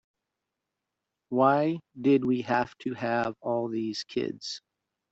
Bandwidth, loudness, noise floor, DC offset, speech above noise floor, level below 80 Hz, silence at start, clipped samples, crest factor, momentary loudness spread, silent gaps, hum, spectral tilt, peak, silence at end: 8 kHz; -28 LUFS; -86 dBFS; under 0.1%; 58 dB; -70 dBFS; 1.3 s; under 0.1%; 20 dB; 10 LU; none; none; -6 dB/octave; -10 dBFS; 0.55 s